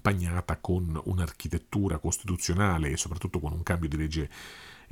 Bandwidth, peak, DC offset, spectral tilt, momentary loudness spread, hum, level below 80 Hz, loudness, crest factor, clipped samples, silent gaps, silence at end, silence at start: 16.5 kHz; -8 dBFS; under 0.1%; -5 dB/octave; 8 LU; none; -40 dBFS; -30 LUFS; 22 dB; under 0.1%; none; 0.05 s; 0.05 s